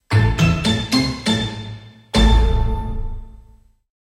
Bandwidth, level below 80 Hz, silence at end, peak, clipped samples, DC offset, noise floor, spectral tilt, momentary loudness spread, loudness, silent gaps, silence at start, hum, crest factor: 12.5 kHz; -22 dBFS; 0.6 s; -2 dBFS; under 0.1%; under 0.1%; -49 dBFS; -5.5 dB/octave; 18 LU; -18 LUFS; none; 0.1 s; none; 16 dB